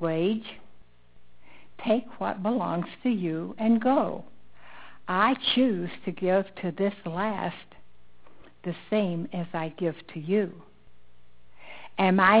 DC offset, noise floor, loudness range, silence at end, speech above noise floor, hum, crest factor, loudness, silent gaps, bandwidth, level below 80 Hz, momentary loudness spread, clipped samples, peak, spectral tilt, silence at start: 0.6%; -62 dBFS; 5 LU; 0 s; 36 dB; 60 Hz at -55 dBFS; 22 dB; -27 LUFS; none; 4 kHz; -64 dBFS; 15 LU; under 0.1%; -6 dBFS; -4 dB/octave; 0 s